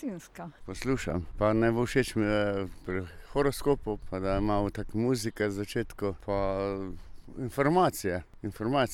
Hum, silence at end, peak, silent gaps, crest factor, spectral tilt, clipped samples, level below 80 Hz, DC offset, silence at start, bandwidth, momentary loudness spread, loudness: none; 0 s; -12 dBFS; none; 18 dB; -6 dB/octave; under 0.1%; -44 dBFS; under 0.1%; 0 s; 17.5 kHz; 13 LU; -30 LUFS